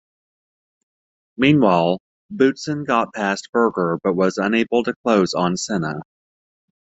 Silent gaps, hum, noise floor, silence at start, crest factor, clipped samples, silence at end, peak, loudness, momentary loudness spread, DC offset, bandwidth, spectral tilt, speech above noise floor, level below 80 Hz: 2.00-2.29 s, 3.49-3.53 s, 4.96-5.04 s; none; under -90 dBFS; 1.4 s; 18 dB; under 0.1%; 0.95 s; -2 dBFS; -19 LUFS; 9 LU; under 0.1%; 8.2 kHz; -5.5 dB/octave; over 71 dB; -60 dBFS